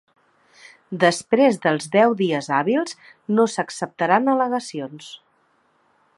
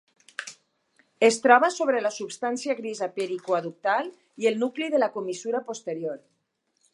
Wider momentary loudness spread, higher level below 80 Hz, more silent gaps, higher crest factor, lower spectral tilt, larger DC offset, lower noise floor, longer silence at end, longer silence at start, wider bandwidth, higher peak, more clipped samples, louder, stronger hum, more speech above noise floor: second, 16 LU vs 19 LU; first, -72 dBFS vs -84 dBFS; neither; about the same, 20 dB vs 24 dB; first, -5 dB/octave vs -3.5 dB/octave; neither; second, -63 dBFS vs -74 dBFS; first, 1 s vs 0.8 s; first, 0.9 s vs 0.4 s; about the same, 11.5 kHz vs 11.5 kHz; about the same, -2 dBFS vs -2 dBFS; neither; first, -20 LUFS vs -25 LUFS; neither; second, 43 dB vs 49 dB